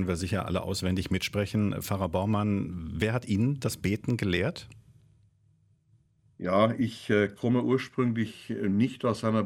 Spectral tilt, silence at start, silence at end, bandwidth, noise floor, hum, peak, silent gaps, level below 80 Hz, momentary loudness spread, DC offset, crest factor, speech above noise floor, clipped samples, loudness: -6.5 dB/octave; 0 s; 0 s; 16 kHz; -66 dBFS; none; -10 dBFS; none; -54 dBFS; 6 LU; under 0.1%; 18 dB; 38 dB; under 0.1%; -29 LUFS